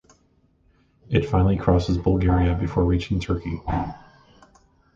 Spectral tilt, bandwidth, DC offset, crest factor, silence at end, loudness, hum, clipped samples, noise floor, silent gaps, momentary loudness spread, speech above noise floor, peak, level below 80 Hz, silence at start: -8.5 dB/octave; 7.4 kHz; under 0.1%; 18 dB; 1 s; -23 LUFS; none; under 0.1%; -62 dBFS; none; 8 LU; 41 dB; -4 dBFS; -32 dBFS; 1.1 s